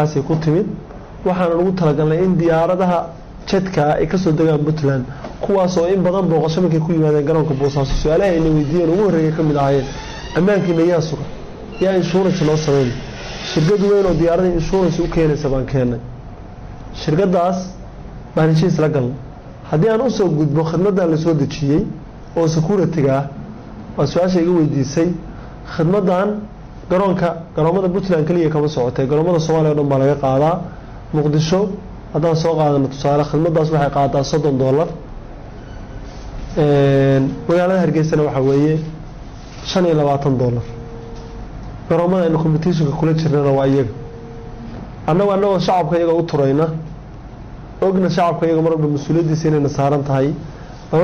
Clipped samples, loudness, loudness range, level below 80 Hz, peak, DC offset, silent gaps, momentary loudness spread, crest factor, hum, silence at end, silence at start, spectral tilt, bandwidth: under 0.1%; -16 LUFS; 3 LU; -36 dBFS; -8 dBFS; under 0.1%; none; 18 LU; 8 dB; none; 0 s; 0 s; -7.5 dB/octave; 7.2 kHz